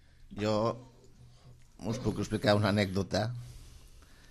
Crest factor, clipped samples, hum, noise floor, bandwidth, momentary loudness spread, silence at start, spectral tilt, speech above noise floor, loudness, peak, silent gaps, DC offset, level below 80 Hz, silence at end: 20 dB; under 0.1%; none; -56 dBFS; 13 kHz; 19 LU; 0.2 s; -6 dB/octave; 26 dB; -31 LUFS; -12 dBFS; none; under 0.1%; -54 dBFS; 0.35 s